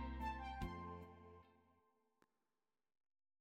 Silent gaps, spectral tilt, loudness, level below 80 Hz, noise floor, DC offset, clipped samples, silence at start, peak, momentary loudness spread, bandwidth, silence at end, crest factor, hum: none; -6.5 dB/octave; -50 LUFS; -58 dBFS; under -90 dBFS; under 0.1%; under 0.1%; 0 s; -34 dBFS; 17 LU; 15.5 kHz; 1.8 s; 20 dB; none